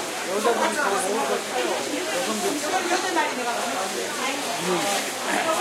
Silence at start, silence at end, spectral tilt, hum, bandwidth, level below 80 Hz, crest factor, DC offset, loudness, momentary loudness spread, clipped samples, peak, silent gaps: 0 s; 0 s; -2 dB/octave; none; 16 kHz; -78 dBFS; 16 dB; under 0.1%; -24 LUFS; 4 LU; under 0.1%; -8 dBFS; none